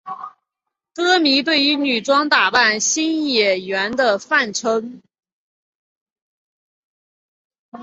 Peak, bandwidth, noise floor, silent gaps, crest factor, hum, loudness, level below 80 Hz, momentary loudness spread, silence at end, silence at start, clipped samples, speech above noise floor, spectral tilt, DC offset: -2 dBFS; 8.2 kHz; -82 dBFS; 5.33-6.16 s, 6.22-7.50 s, 7.59-7.72 s; 18 dB; none; -16 LUFS; -66 dBFS; 14 LU; 0 s; 0.05 s; under 0.1%; 64 dB; -1.5 dB/octave; under 0.1%